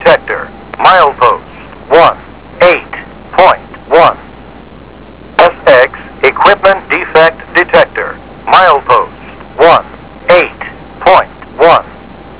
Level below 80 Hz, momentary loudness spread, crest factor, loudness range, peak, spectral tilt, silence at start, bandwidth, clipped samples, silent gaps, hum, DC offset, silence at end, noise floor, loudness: -38 dBFS; 16 LU; 10 dB; 2 LU; 0 dBFS; -7.5 dB/octave; 0 s; 4 kHz; 4%; none; none; 0.7%; 0.05 s; -32 dBFS; -8 LUFS